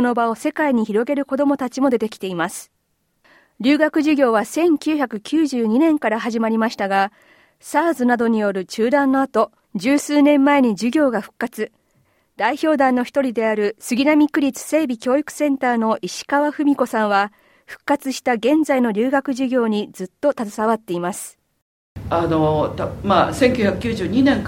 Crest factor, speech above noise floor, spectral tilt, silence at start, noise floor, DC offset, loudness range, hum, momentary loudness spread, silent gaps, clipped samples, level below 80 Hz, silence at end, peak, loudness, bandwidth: 16 dB; 50 dB; -5.5 dB/octave; 0 s; -68 dBFS; under 0.1%; 3 LU; none; 8 LU; 21.62-21.96 s; under 0.1%; -50 dBFS; 0 s; -2 dBFS; -19 LUFS; 16.5 kHz